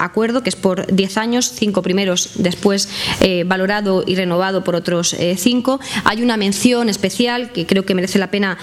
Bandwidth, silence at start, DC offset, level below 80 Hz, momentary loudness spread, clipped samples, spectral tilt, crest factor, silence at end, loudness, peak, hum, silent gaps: 15 kHz; 0 s; under 0.1%; -46 dBFS; 3 LU; under 0.1%; -4 dB/octave; 16 dB; 0 s; -16 LUFS; 0 dBFS; none; none